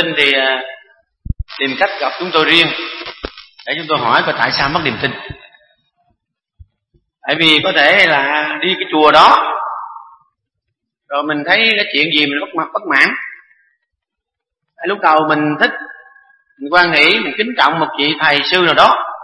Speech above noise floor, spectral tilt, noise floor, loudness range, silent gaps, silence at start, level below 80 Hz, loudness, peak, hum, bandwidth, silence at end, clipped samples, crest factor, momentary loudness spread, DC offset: 67 dB; -4.5 dB/octave; -80 dBFS; 6 LU; none; 0 s; -40 dBFS; -12 LUFS; 0 dBFS; none; 11 kHz; 0 s; 0.2%; 16 dB; 18 LU; under 0.1%